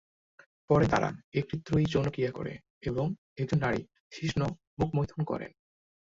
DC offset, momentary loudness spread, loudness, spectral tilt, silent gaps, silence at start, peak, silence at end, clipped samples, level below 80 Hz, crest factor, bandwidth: under 0.1%; 11 LU; -31 LUFS; -7.5 dB/octave; 1.24-1.32 s, 2.70-2.81 s, 3.18-3.36 s, 4.00-4.11 s, 4.67-4.77 s; 0.7 s; -12 dBFS; 0.6 s; under 0.1%; -52 dBFS; 20 dB; 7.8 kHz